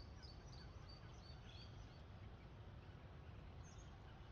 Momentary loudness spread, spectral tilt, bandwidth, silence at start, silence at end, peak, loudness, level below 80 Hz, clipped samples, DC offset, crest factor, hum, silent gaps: 2 LU; -5 dB/octave; 7.2 kHz; 0 s; 0 s; -46 dBFS; -59 LUFS; -62 dBFS; under 0.1%; under 0.1%; 12 dB; none; none